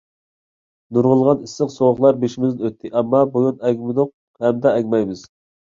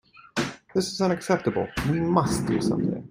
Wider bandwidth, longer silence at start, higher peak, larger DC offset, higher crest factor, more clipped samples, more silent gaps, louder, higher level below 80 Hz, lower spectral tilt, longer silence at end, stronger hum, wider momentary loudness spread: second, 7.6 kHz vs 16 kHz; first, 0.9 s vs 0.35 s; first, -2 dBFS vs -6 dBFS; neither; about the same, 18 dB vs 20 dB; neither; first, 4.14-4.34 s vs none; first, -18 LUFS vs -26 LUFS; second, -60 dBFS vs -48 dBFS; first, -8 dB/octave vs -5.5 dB/octave; first, 0.55 s vs 0.05 s; neither; about the same, 9 LU vs 7 LU